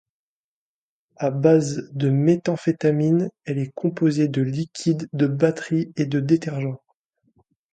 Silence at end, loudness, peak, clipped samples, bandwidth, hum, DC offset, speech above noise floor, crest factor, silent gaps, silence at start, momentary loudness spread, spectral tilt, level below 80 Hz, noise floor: 0.95 s; -22 LUFS; -4 dBFS; under 0.1%; 9.2 kHz; none; under 0.1%; over 69 dB; 18 dB; none; 1.2 s; 9 LU; -7.5 dB/octave; -64 dBFS; under -90 dBFS